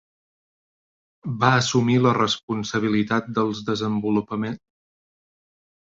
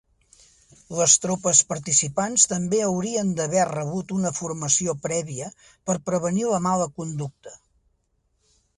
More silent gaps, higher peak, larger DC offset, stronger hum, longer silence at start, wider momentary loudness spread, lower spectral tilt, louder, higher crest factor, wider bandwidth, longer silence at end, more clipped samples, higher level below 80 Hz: first, 2.43-2.48 s vs none; about the same, -2 dBFS vs -2 dBFS; neither; neither; first, 1.25 s vs 0.9 s; second, 11 LU vs 14 LU; first, -5.5 dB/octave vs -3.5 dB/octave; about the same, -22 LUFS vs -22 LUFS; about the same, 22 dB vs 22 dB; second, 7.8 kHz vs 11.5 kHz; first, 1.35 s vs 1.2 s; neither; about the same, -58 dBFS vs -60 dBFS